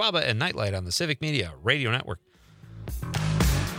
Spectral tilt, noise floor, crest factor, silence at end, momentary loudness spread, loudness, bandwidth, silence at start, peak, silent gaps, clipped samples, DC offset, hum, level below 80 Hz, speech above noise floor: -4.5 dB/octave; -49 dBFS; 20 dB; 0 s; 14 LU; -26 LUFS; 16.5 kHz; 0 s; -8 dBFS; none; under 0.1%; under 0.1%; none; -38 dBFS; 21 dB